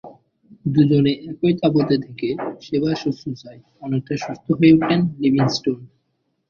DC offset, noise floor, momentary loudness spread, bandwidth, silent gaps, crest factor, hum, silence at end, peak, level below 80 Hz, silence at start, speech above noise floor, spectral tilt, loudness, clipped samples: under 0.1%; -71 dBFS; 14 LU; 7.2 kHz; none; 18 dB; none; 0.65 s; -2 dBFS; -56 dBFS; 0.05 s; 52 dB; -7.5 dB/octave; -19 LUFS; under 0.1%